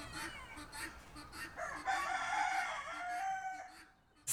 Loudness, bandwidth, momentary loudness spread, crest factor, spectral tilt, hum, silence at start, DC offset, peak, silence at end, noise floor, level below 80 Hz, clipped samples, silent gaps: -41 LUFS; 19.5 kHz; 14 LU; 18 dB; -1.5 dB/octave; none; 0 s; under 0.1%; -24 dBFS; 0 s; -63 dBFS; -64 dBFS; under 0.1%; none